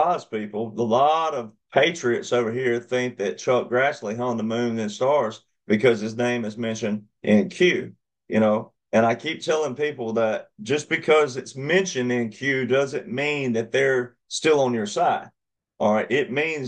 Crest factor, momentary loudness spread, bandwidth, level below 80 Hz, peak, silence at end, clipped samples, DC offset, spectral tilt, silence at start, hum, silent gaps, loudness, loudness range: 18 dB; 8 LU; 9.8 kHz; -70 dBFS; -4 dBFS; 0 s; under 0.1%; under 0.1%; -5 dB/octave; 0 s; none; none; -23 LUFS; 1 LU